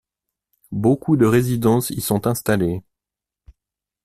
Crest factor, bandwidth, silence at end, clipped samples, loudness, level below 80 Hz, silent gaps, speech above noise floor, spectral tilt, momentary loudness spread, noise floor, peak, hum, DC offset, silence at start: 18 dB; 16 kHz; 1.25 s; under 0.1%; -19 LUFS; -48 dBFS; none; 70 dB; -6.5 dB/octave; 8 LU; -88 dBFS; -4 dBFS; none; under 0.1%; 0.7 s